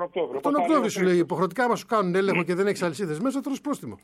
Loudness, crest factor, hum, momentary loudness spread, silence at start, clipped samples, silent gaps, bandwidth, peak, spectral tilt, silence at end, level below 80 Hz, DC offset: -25 LUFS; 14 dB; none; 7 LU; 0 s; under 0.1%; none; 15 kHz; -10 dBFS; -6 dB/octave; 0.1 s; -70 dBFS; under 0.1%